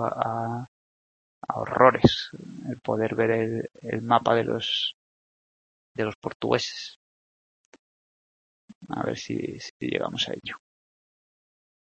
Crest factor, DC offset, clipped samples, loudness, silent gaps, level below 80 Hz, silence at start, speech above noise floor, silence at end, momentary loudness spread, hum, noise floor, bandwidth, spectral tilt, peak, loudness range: 26 dB; under 0.1%; under 0.1%; -26 LUFS; 0.68-1.42 s, 4.94-5.95 s, 6.15-6.22 s, 6.35-6.40 s, 6.96-7.72 s, 7.79-8.68 s, 8.75-8.81 s, 9.70-9.80 s; -56 dBFS; 0 s; over 64 dB; 1.25 s; 16 LU; none; under -90 dBFS; 8.6 kHz; -5.5 dB/octave; -2 dBFS; 9 LU